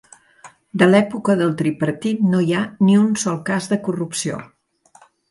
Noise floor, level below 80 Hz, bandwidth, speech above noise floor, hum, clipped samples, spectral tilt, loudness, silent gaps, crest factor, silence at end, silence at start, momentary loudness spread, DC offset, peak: -52 dBFS; -62 dBFS; 11.5 kHz; 35 dB; none; under 0.1%; -6 dB/octave; -18 LUFS; none; 18 dB; 0.85 s; 0.45 s; 9 LU; under 0.1%; 0 dBFS